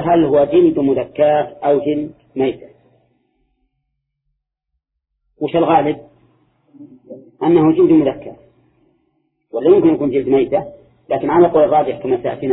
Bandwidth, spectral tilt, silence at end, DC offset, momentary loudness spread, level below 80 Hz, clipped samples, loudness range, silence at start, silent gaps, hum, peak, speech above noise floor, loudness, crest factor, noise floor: 4 kHz; -11.5 dB/octave; 0 s; under 0.1%; 13 LU; -52 dBFS; under 0.1%; 10 LU; 0 s; none; none; 0 dBFS; 61 dB; -15 LUFS; 16 dB; -75 dBFS